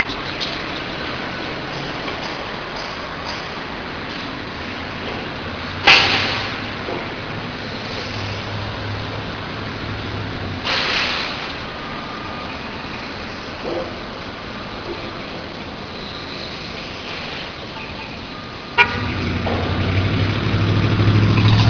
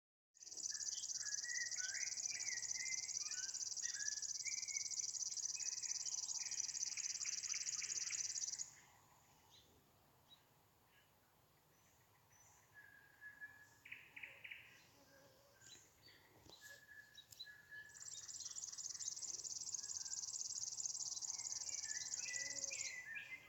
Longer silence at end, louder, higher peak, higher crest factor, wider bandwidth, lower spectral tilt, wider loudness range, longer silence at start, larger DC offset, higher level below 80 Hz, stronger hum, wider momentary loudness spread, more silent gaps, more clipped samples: about the same, 0 s vs 0 s; first, -22 LUFS vs -44 LUFS; first, 0 dBFS vs -28 dBFS; about the same, 22 dB vs 20 dB; second, 5.4 kHz vs 17.5 kHz; first, -5.5 dB/octave vs 2.5 dB/octave; second, 10 LU vs 17 LU; second, 0 s vs 0.4 s; neither; first, -38 dBFS vs -88 dBFS; neither; second, 13 LU vs 18 LU; neither; neither